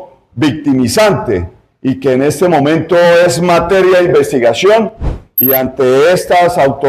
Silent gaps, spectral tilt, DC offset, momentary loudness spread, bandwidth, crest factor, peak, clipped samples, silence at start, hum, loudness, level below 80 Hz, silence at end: none; -5.5 dB/octave; under 0.1%; 10 LU; 15.5 kHz; 10 dB; 0 dBFS; under 0.1%; 0 s; none; -10 LUFS; -32 dBFS; 0 s